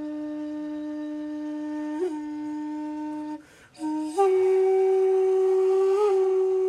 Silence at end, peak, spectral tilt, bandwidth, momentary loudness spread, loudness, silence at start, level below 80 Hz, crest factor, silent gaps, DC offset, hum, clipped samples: 0 s; -12 dBFS; -5 dB/octave; 10 kHz; 12 LU; -25 LUFS; 0 s; -70 dBFS; 14 dB; none; under 0.1%; none; under 0.1%